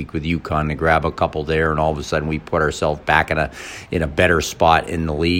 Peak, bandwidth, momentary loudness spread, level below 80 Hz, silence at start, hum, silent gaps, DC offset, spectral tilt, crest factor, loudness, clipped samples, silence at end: 0 dBFS; 16.5 kHz; 7 LU; -36 dBFS; 0 s; none; none; under 0.1%; -5.5 dB/octave; 18 dB; -19 LUFS; under 0.1%; 0 s